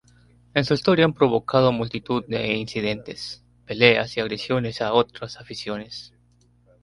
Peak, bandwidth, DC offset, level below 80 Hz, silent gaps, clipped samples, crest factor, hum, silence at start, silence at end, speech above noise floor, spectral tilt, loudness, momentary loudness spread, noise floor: 0 dBFS; 11.5 kHz; under 0.1%; -54 dBFS; none; under 0.1%; 22 dB; 60 Hz at -45 dBFS; 0.55 s; 0.75 s; 37 dB; -6 dB/octave; -22 LUFS; 16 LU; -59 dBFS